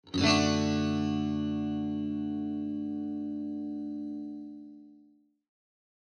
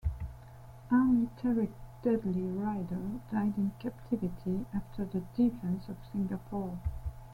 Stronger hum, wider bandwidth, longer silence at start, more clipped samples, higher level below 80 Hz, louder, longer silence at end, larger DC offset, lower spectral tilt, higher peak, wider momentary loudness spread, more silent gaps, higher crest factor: neither; second, 9.8 kHz vs 16 kHz; about the same, 0.05 s vs 0.05 s; neither; second, -62 dBFS vs -48 dBFS; first, -31 LUFS vs -34 LUFS; first, 1.1 s vs 0 s; neither; second, -5 dB/octave vs -9.5 dB/octave; first, -10 dBFS vs -16 dBFS; first, 15 LU vs 11 LU; neither; first, 22 dB vs 16 dB